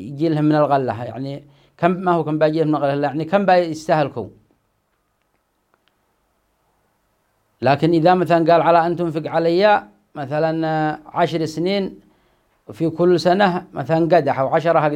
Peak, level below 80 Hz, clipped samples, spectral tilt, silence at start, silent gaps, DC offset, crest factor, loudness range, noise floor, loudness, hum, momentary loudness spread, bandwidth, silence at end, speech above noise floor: -2 dBFS; -60 dBFS; under 0.1%; -7.5 dB/octave; 0 s; none; under 0.1%; 18 dB; 6 LU; -67 dBFS; -18 LUFS; none; 11 LU; 11.5 kHz; 0 s; 50 dB